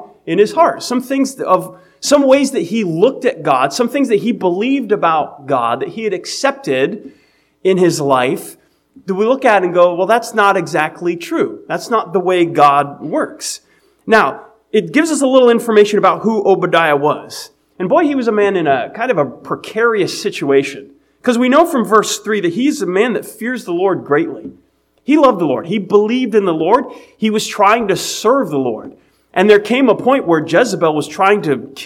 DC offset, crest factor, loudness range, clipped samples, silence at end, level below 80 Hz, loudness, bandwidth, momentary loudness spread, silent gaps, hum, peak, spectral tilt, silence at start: under 0.1%; 14 dB; 3 LU; 0.1%; 0 s; -60 dBFS; -14 LUFS; 16.5 kHz; 11 LU; none; none; 0 dBFS; -4.5 dB/octave; 0 s